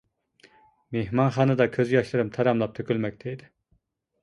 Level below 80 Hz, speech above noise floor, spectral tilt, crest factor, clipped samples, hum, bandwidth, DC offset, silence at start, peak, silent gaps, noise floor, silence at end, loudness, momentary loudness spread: -58 dBFS; 45 dB; -8 dB/octave; 18 dB; under 0.1%; none; 11 kHz; under 0.1%; 0.9 s; -8 dBFS; none; -70 dBFS; 0.85 s; -25 LUFS; 13 LU